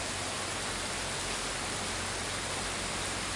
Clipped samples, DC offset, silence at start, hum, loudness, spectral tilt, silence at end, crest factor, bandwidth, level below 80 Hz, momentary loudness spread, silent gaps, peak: under 0.1%; under 0.1%; 0 s; none; -33 LUFS; -2 dB/octave; 0 s; 14 dB; 11.5 kHz; -50 dBFS; 1 LU; none; -20 dBFS